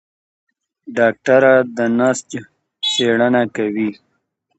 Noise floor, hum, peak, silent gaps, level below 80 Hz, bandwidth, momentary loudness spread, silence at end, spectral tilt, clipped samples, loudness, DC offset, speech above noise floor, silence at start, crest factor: -68 dBFS; none; 0 dBFS; none; -64 dBFS; 8.8 kHz; 12 LU; 0.65 s; -4 dB/octave; under 0.1%; -16 LUFS; under 0.1%; 53 dB; 0.85 s; 16 dB